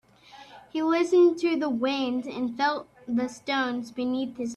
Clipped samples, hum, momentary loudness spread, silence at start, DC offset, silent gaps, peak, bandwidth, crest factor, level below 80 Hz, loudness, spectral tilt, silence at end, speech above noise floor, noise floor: under 0.1%; none; 10 LU; 0.35 s; under 0.1%; none; -12 dBFS; 9.4 kHz; 14 dB; -68 dBFS; -26 LUFS; -4.5 dB/octave; 0 s; 25 dB; -51 dBFS